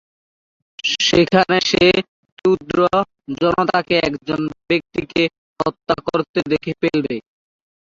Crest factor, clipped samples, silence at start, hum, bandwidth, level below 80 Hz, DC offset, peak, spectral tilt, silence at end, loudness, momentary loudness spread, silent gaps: 18 dB; under 0.1%; 0.85 s; none; 7.6 kHz; -50 dBFS; under 0.1%; -2 dBFS; -4.5 dB/octave; 0.65 s; -18 LUFS; 10 LU; 2.08-2.23 s, 2.32-2.37 s, 5.38-5.56 s, 6.29-6.34 s